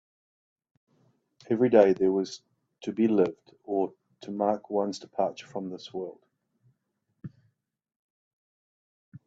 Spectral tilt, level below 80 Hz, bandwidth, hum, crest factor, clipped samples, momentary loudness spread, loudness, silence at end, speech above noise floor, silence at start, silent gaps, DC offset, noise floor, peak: -6.5 dB/octave; -74 dBFS; 8 kHz; none; 26 dB; under 0.1%; 25 LU; -27 LUFS; 0.1 s; 52 dB; 1.5 s; 7.96-9.12 s; under 0.1%; -79 dBFS; -4 dBFS